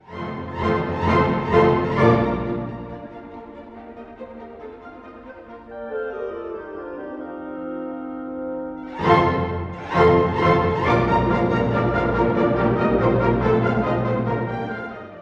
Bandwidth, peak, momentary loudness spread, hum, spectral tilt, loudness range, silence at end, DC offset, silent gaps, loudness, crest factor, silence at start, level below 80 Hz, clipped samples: 7.6 kHz; -2 dBFS; 21 LU; none; -8.5 dB/octave; 15 LU; 0 s; under 0.1%; none; -21 LUFS; 18 dB; 0.1 s; -40 dBFS; under 0.1%